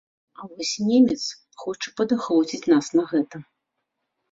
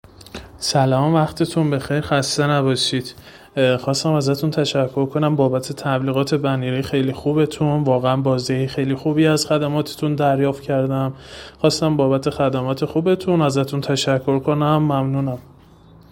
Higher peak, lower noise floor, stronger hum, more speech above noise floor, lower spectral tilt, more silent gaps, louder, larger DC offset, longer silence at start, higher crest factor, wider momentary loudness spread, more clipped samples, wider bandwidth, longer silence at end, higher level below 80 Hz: second, -6 dBFS vs 0 dBFS; first, -79 dBFS vs -46 dBFS; neither; first, 57 dB vs 28 dB; second, -4.5 dB/octave vs -6 dB/octave; neither; second, -23 LUFS vs -19 LUFS; neither; first, 0.4 s vs 0.2 s; about the same, 18 dB vs 18 dB; first, 16 LU vs 5 LU; neither; second, 7.8 kHz vs 17 kHz; first, 0.9 s vs 0.7 s; second, -66 dBFS vs -52 dBFS